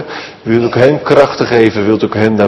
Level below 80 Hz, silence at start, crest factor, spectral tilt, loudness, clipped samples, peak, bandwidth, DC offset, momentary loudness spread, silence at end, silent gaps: -46 dBFS; 0 s; 10 dB; -7 dB/octave; -10 LUFS; 2%; 0 dBFS; 10 kHz; under 0.1%; 6 LU; 0 s; none